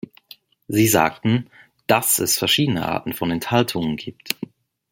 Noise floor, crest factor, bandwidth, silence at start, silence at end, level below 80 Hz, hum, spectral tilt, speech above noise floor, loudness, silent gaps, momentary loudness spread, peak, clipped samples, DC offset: -49 dBFS; 22 dB; 17 kHz; 0.7 s; 0.45 s; -56 dBFS; none; -3.5 dB/octave; 29 dB; -20 LUFS; none; 11 LU; 0 dBFS; under 0.1%; under 0.1%